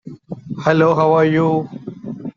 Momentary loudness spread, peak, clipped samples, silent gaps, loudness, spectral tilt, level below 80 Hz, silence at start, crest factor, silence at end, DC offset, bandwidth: 18 LU; 0 dBFS; under 0.1%; none; -15 LUFS; -8 dB/octave; -56 dBFS; 0.05 s; 16 dB; 0.05 s; under 0.1%; 7.2 kHz